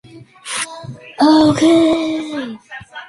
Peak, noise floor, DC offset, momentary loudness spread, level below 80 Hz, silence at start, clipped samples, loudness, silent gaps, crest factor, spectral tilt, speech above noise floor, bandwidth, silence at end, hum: -2 dBFS; -34 dBFS; under 0.1%; 21 LU; -50 dBFS; 0.15 s; under 0.1%; -14 LUFS; none; 14 dB; -4.5 dB/octave; 21 dB; 11.5 kHz; 0.05 s; none